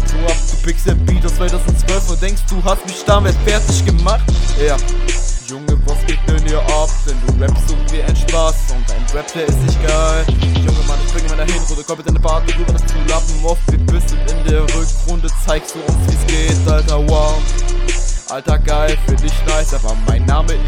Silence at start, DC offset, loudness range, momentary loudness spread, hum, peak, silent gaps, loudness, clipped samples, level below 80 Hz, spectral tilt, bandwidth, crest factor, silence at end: 0 s; under 0.1%; 2 LU; 5 LU; none; 0 dBFS; none; -16 LUFS; under 0.1%; -14 dBFS; -5 dB/octave; 12 kHz; 12 dB; 0 s